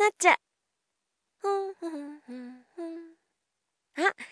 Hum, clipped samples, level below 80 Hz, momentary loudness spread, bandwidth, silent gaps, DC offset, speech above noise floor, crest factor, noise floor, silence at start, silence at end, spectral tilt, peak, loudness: none; under 0.1%; under -90 dBFS; 21 LU; 11 kHz; none; under 0.1%; 54 dB; 24 dB; -83 dBFS; 0 s; 0.05 s; -0.5 dB/octave; -6 dBFS; -28 LUFS